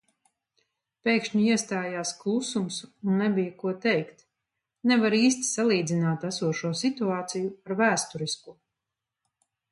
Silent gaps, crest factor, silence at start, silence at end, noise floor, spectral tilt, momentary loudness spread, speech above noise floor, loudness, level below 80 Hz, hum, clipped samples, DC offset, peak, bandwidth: none; 20 dB; 1.05 s; 1.2 s; -87 dBFS; -4.5 dB/octave; 9 LU; 61 dB; -27 LUFS; -74 dBFS; none; under 0.1%; under 0.1%; -8 dBFS; 11.5 kHz